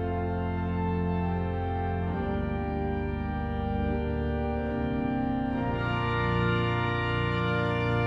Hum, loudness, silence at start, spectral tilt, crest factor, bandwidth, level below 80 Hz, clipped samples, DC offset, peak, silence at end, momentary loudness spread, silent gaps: none; -29 LUFS; 0 s; -9 dB/octave; 14 dB; 7.4 kHz; -38 dBFS; under 0.1%; under 0.1%; -14 dBFS; 0 s; 4 LU; none